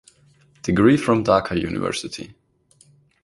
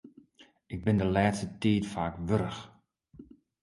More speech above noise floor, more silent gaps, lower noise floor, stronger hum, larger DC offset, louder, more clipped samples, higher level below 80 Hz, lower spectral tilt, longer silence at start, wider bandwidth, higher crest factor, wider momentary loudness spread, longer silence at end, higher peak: first, 38 dB vs 32 dB; neither; second, -57 dBFS vs -61 dBFS; neither; neither; first, -20 LUFS vs -30 LUFS; neither; about the same, -46 dBFS vs -50 dBFS; about the same, -6 dB/octave vs -7 dB/octave; first, 0.65 s vs 0.05 s; about the same, 11.5 kHz vs 11.5 kHz; about the same, 20 dB vs 20 dB; first, 17 LU vs 10 LU; first, 0.9 s vs 0.4 s; first, -2 dBFS vs -12 dBFS